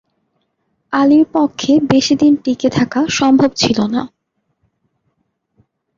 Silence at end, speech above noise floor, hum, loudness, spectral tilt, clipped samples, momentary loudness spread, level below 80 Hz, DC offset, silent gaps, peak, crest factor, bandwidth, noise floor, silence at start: 1.9 s; 56 dB; none; -13 LUFS; -5 dB/octave; under 0.1%; 7 LU; -50 dBFS; under 0.1%; none; -2 dBFS; 14 dB; 7.6 kHz; -69 dBFS; 0.9 s